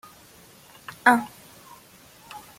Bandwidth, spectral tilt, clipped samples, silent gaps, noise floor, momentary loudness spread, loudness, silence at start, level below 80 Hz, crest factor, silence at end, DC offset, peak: 16.5 kHz; -3.5 dB/octave; under 0.1%; none; -51 dBFS; 27 LU; -21 LUFS; 1.05 s; -68 dBFS; 26 dB; 0.2 s; under 0.1%; -2 dBFS